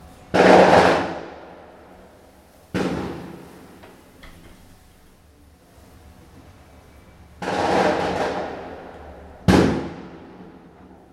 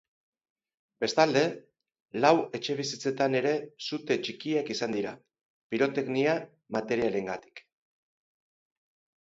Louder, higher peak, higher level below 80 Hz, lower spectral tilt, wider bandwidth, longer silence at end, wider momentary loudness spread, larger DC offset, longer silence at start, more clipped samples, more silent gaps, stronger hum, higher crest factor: first, -19 LUFS vs -29 LUFS; first, 0 dBFS vs -6 dBFS; first, -44 dBFS vs -72 dBFS; first, -6 dB/octave vs -4.5 dB/octave; first, 14.5 kHz vs 8 kHz; second, 0.6 s vs 1.6 s; first, 28 LU vs 12 LU; neither; second, 0.35 s vs 1 s; neither; second, none vs 2.02-2.06 s, 5.45-5.70 s; neither; about the same, 22 dB vs 24 dB